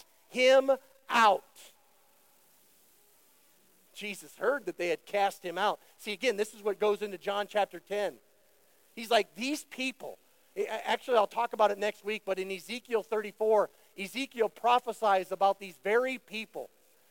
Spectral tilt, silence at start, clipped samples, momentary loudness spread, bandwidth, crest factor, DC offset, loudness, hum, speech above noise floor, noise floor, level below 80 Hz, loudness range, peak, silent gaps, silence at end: -3 dB/octave; 0.3 s; under 0.1%; 14 LU; 17 kHz; 20 dB; under 0.1%; -30 LUFS; none; 36 dB; -67 dBFS; -86 dBFS; 5 LU; -12 dBFS; none; 0.45 s